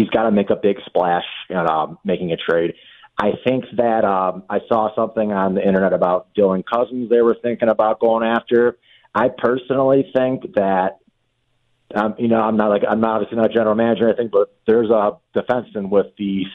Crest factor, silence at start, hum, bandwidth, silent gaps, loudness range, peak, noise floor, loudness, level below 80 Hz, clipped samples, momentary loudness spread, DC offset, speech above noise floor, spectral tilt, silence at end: 16 dB; 0 s; none; 4.6 kHz; none; 3 LU; -2 dBFS; -66 dBFS; -18 LUFS; -56 dBFS; under 0.1%; 6 LU; under 0.1%; 49 dB; -9 dB/octave; 0 s